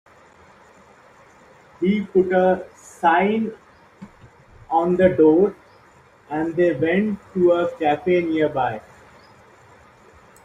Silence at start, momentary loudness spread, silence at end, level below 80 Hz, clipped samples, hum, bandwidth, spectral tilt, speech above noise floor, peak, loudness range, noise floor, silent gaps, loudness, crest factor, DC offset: 1.8 s; 11 LU; 1.65 s; -56 dBFS; under 0.1%; none; 9.8 kHz; -7.5 dB/octave; 33 dB; -4 dBFS; 3 LU; -52 dBFS; none; -20 LUFS; 18 dB; under 0.1%